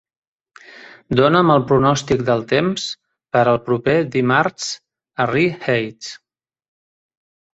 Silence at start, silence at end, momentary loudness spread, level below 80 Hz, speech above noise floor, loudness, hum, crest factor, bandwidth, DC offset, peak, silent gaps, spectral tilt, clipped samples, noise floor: 0.75 s; 1.4 s; 14 LU; -50 dBFS; 27 dB; -17 LUFS; none; 18 dB; 8.2 kHz; under 0.1%; -2 dBFS; none; -5.5 dB/octave; under 0.1%; -44 dBFS